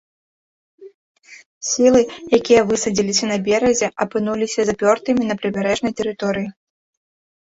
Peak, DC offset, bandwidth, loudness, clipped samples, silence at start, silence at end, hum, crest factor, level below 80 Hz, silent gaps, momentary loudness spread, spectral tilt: -2 dBFS; under 0.1%; 8 kHz; -18 LUFS; under 0.1%; 0.8 s; 1.05 s; none; 18 dB; -54 dBFS; 0.94-1.15 s, 1.46-1.61 s; 9 LU; -4 dB/octave